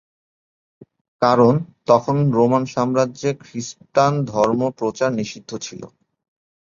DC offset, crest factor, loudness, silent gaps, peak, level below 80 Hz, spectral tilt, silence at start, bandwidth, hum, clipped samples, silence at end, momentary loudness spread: under 0.1%; 18 dB; -19 LUFS; none; -2 dBFS; -58 dBFS; -6.5 dB/octave; 1.2 s; 7.6 kHz; none; under 0.1%; 0.8 s; 15 LU